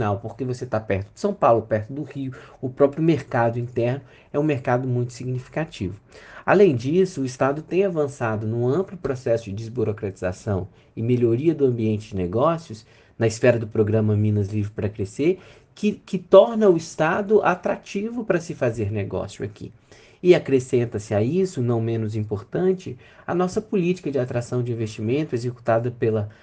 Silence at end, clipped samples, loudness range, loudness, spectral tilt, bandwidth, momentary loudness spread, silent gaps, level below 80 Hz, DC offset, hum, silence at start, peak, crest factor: 0.1 s; under 0.1%; 5 LU; -23 LUFS; -7.5 dB/octave; 9.4 kHz; 11 LU; none; -56 dBFS; under 0.1%; none; 0 s; 0 dBFS; 22 dB